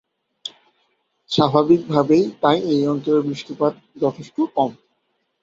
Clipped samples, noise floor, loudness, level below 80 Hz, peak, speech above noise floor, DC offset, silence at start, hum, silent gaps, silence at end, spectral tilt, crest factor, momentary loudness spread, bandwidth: under 0.1%; -70 dBFS; -19 LUFS; -62 dBFS; -2 dBFS; 52 dB; under 0.1%; 0.45 s; none; none; 0.7 s; -7 dB/octave; 18 dB; 11 LU; 7.8 kHz